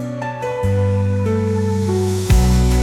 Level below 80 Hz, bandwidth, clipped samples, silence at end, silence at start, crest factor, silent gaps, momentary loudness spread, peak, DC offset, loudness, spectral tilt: -22 dBFS; 15.5 kHz; under 0.1%; 0 s; 0 s; 12 dB; none; 8 LU; -4 dBFS; under 0.1%; -18 LUFS; -7 dB/octave